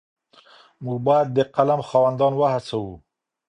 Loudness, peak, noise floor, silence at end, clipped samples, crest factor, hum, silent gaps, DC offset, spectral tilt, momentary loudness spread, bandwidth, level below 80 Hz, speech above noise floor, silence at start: -21 LUFS; -4 dBFS; -52 dBFS; 0.5 s; under 0.1%; 18 dB; none; none; under 0.1%; -7.5 dB/octave; 11 LU; 10 kHz; -58 dBFS; 32 dB; 0.8 s